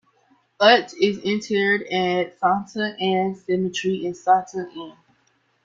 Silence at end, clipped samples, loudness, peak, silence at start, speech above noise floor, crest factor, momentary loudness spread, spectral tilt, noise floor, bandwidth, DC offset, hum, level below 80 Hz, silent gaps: 0.75 s; under 0.1%; -21 LUFS; -2 dBFS; 0.6 s; 44 dB; 20 dB; 13 LU; -4.5 dB/octave; -65 dBFS; 7.6 kHz; under 0.1%; none; -66 dBFS; none